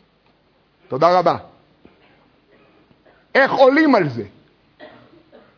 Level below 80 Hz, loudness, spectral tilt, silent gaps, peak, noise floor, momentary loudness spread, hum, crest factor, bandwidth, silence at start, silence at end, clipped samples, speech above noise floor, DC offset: -64 dBFS; -16 LUFS; -6.5 dB/octave; none; -2 dBFS; -59 dBFS; 17 LU; none; 20 dB; 5.4 kHz; 0.9 s; 0.7 s; under 0.1%; 44 dB; under 0.1%